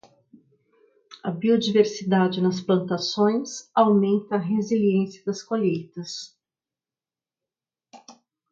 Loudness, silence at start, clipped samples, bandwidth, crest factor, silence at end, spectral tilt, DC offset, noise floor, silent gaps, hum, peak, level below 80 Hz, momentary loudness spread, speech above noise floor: -23 LUFS; 1.1 s; under 0.1%; 7.6 kHz; 20 dB; 0.4 s; -6 dB/octave; under 0.1%; under -90 dBFS; none; none; -6 dBFS; -70 dBFS; 14 LU; over 68 dB